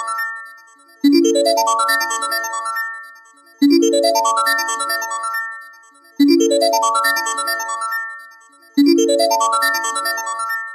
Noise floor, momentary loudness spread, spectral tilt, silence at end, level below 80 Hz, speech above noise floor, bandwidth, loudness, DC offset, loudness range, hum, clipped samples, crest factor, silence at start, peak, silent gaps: -46 dBFS; 11 LU; -1 dB/octave; 0 s; -74 dBFS; 29 dB; 15 kHz; -16 LUFS; under 0.1%; 1 LU; none; under 0.1%; 14 dB; 0 s; -2 dBFS; none